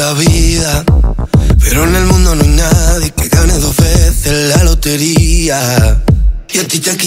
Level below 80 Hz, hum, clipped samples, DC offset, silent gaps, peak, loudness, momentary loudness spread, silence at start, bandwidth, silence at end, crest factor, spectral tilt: -12 dBFS; none; under 0.1%; under 0.1%; none; 0 dBFS; -10 LUFS; 3 LU; 0 s; 16.5 kHz; 0 s; 8 dB; -4.5 dB/octave